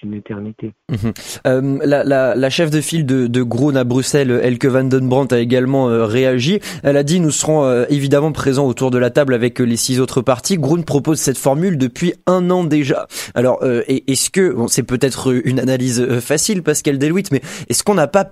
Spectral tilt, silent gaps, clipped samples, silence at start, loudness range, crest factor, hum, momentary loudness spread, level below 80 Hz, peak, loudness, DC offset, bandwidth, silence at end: -5 dB/octave; none; under 0.1%; 0.05 s; 2 LU; 16 dB; none; 4 LU; -48 dBFS; 0 dBFS; -15 LUFS; under 0.1%; 15 kHz; 0.05 s